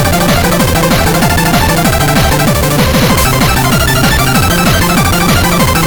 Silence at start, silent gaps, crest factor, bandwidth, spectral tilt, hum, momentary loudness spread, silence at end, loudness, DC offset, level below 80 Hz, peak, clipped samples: 0 s; none; 8 dB; over 20 kHz; -4.5 dB/octave; none; 1 LU; 0 s; -9 LUFS; under 0.1%; -18 dBFS; 0 dBFS; under 0.1%